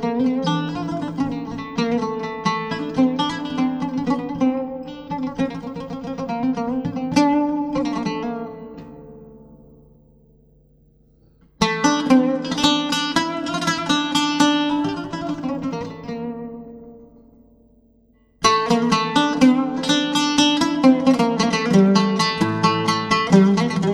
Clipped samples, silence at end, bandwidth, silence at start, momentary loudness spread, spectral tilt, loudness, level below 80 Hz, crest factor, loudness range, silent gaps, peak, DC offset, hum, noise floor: under 0.1%; 0 s; 13 kHz; 0 s; 14 LU; -5 dB/octave; -20 LUFS; -52 dBFS; 20 dB; 11 LU; none; -2 dBFS; under 0.1%; none; -57 dBFS